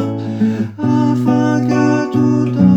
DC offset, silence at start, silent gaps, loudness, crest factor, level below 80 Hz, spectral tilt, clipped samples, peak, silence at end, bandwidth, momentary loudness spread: under 0.1%; 0 s; none; -15 LUFS; 14 dB; -56 dBFS; -8 dB/octave; under 0.1%; 0 dBFS; 0 s; 8.2 kHz; 4 LU